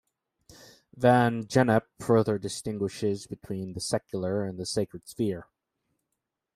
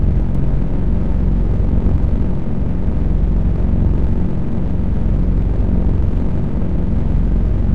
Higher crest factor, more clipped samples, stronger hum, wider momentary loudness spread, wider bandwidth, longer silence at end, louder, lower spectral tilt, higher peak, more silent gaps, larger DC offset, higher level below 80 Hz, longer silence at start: first, 22 dB vs 10 dB; neither; neither; first, 13 LU vs 3 LU; first, 15 kHz vs 3.6 kHz; first, 1.15 s vs 0 s; second, -28 LUFS vs -19 LUFS; second, -6 dB/octave vs -11 dB/octave; second, -8 dBFS vs -4 dBFS; neither; second, under 0.1% vs 10%; second, -62 dBFS vs -18 dBFS; first, 0.95 s vs 0 s